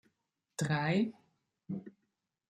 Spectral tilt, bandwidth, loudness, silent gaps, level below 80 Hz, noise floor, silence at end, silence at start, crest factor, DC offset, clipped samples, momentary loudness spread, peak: -6 dB/octave; 13 kHz; -35 LUFS; none; -74 dBFS; -84 dBFS; 0.6 s; 0.6 s; 18 dB; under 0.1%; under 0.1%; 13 LU; -20 dBFS